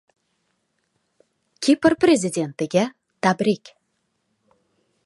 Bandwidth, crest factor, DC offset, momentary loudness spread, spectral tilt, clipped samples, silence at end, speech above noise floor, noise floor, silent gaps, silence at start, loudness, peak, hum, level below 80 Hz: 11.5 kHz; 20 dB; under 0.1%; 9 LU; -5 dB/octave; under 0.1%; 1.5 s; 53 dB; -72 dBFS; none; 1.6 s; -21 LUFS; -2 dBFS; none; -62 dBFS